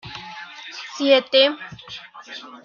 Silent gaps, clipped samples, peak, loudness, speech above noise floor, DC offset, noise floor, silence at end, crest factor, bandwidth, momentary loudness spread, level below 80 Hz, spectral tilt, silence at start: none; under 0.1%; -2 dBFS; -17 LUFS; 20 dB; under 0.1%; -39 dBFS; 0.2 s; 20 dB; 7.2 kHz; 21 LU; -64 dBFS; -3.5 dB/octave; 0.05 s